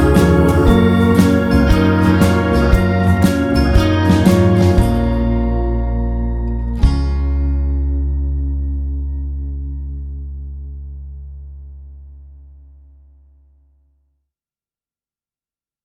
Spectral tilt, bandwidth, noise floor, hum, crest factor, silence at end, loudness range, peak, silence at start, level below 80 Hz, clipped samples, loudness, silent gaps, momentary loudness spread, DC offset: -7.5 dB/octave; 15 kHz; under -90 dBFS; none; 14 dB; 3.5 s; 18 LU; 0 dBFS; 0 s; -20 dBFS; under 0.1%; -15 LUFS; none; 19 LU; under 0.1%